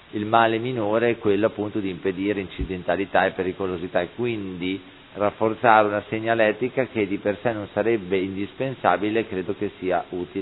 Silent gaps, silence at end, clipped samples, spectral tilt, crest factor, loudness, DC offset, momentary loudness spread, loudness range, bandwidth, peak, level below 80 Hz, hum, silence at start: none; 0 s; under 0.1%; -10 dB/octave; 22 dB; -24 LUFS; under 0.1%; 9 LU; 3 LU; 4.1 kHz; 0 dBFS; -50 dBFS; none; 0.15 s